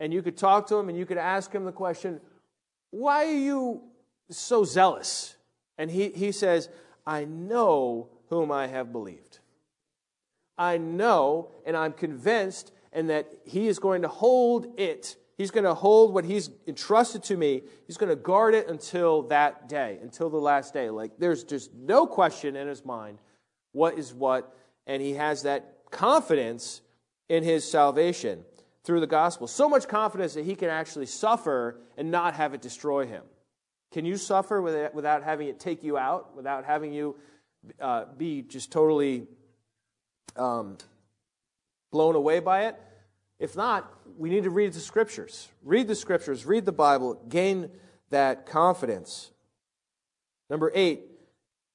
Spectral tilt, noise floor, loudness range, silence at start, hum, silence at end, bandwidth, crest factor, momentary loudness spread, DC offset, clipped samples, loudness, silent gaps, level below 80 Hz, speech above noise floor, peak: -5 dB/octave; -88 dBFS; 6 LU; 0 s; none; 0.7 s; 11 kHz; 20 dB; 14 LU; under 0.1%; under 0.1%; -26 LUFS; none; -82 dBFS; 62 dB; -6 dBFS